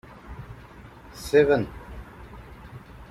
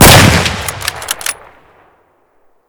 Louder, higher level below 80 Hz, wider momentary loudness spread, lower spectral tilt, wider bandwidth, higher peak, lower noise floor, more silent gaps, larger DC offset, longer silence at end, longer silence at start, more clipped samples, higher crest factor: second, -22 LUFS vs -10 LUFS; second, -46 dBFS vs -24 dBFS; first, 25 LU vs 16 LU; first, -6 dB/octave vs -3.5 dB/octave; second, 15 kHz vs over 20 kHz; second, -6 dBFS vs 0 dBFS; second, -46 dBFS vs -53 dBFS; neither; neither; second, 0.05 s vs 1.35 s; first, 0.3 s vs 0 s; second, under 0.1% vs 4%; first, 22 dB vs 12 dB